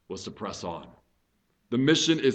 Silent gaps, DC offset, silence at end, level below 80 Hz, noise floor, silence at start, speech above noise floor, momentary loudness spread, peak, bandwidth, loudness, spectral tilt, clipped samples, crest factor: none; under 0.1%; 0 s; -64 dBFS; -72 dBFS; 0.1 s; 45 dB; 17 LU; -10 dBFS; 8.8 kHz; -26 LUFS; -4 dB/octave; under 0.1%; 18 dB